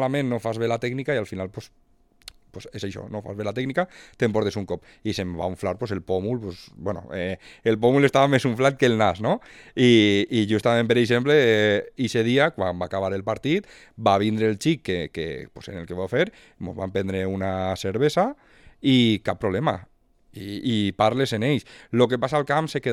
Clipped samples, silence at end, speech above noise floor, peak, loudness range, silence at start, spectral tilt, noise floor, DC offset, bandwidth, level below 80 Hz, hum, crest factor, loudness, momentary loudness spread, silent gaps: under 0.1%; 0 s; 26 dB; -4 dBFS; 9 LU; 0 s; -6 dB/octave; -49 dBFS; under 0.1%; 14.5 kHz; -56 dBFS; none; 20 dB; -23 LUFS; 15 LU; none